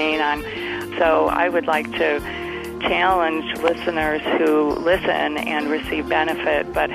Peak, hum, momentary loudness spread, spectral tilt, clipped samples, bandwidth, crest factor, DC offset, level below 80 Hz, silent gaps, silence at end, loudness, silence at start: -4 dBFS; none; 7 LU; -5 dB/octave; under 0.1%; 15.5 kHz; 16 dB; under 0.1%; -44 dBFS; none; 0 s; -20 LUFS; 0 s